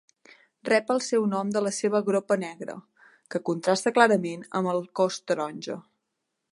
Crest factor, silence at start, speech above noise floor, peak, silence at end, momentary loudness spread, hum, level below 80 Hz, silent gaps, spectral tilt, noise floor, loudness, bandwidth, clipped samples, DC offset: 24 dB; 0.65 s; 56 dB; -4 dBFS; 0.75 s; 16 LU; none; -78 dBFS; none; -4.5 dB/octave; -81 dBFS; -26 LUFS; 11.5 kHz; under 0.1%; under 0.1%